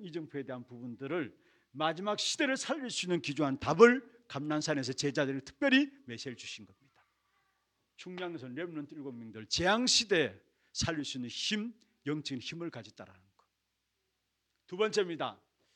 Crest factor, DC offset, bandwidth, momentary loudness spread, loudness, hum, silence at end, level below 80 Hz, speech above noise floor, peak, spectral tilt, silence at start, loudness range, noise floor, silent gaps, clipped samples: 28 dB; under 0.1%; 11 kHz; 18 LU; -32 LUFS; none; 0.4 s; -66 dBFS; 49 dB; -8 dBFS; -3.5 dB/octave; 0 s; 11 LU; -83 dBFS; none; under 0.1%